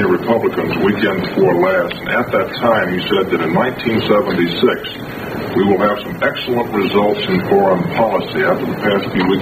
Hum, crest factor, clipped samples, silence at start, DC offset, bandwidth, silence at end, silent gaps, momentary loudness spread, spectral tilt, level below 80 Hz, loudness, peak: none; 14 dB; under 0.1%; 0 s; under 0.1%; 14.5 kHz; 0 s; none; 5 LU; -7 dB/octave; -46 dBFS; -16 LUFS; 0 dBFS